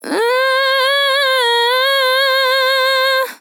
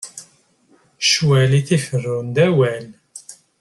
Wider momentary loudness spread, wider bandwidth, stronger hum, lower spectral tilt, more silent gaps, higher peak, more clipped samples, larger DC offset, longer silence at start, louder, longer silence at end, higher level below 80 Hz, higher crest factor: second, 1 LU vs 23 LU; first, 19.5 kHz vs 12 kHz; neither; second, 1 dB/octave vs -5 dB/octave; neither; about the same, -4 dBFS vs -4 dBFS; neither; neither; about the same, 0.05 s vs 0 s; first, -13 LUFS vs -17 LUFS; second, 0.05 s vs 0.25 s; second, under -90 dBFS vs -56 dBFS; second, 10 dB vs 16 dB